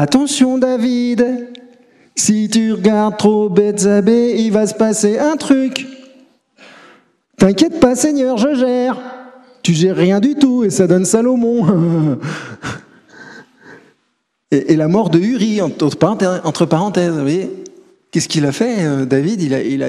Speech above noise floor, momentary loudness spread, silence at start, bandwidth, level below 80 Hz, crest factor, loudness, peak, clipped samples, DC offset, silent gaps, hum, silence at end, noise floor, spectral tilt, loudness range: 53 dB; 9 LU; 0 s; 13 kHz; -52 dBFS; 14 dB; -14 LUFS; 0 dBFS; under 0.1%; under 0.1%; none; none; 0 s; -66 dBFS; -5.5 dB/octave; 4 LU